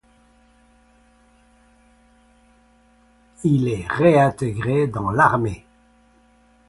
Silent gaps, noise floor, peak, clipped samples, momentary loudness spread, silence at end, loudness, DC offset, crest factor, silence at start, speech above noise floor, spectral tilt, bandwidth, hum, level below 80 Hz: none; -56 dBFS; -2 dBFS; under 0.1%; 10 LU; 1.1 s; -19 LUFS; under 0.1%; 22 dB; 3.4 s; 38 dB; -7.5 dB/octave; 11.5 kHz; none; -48 dBFS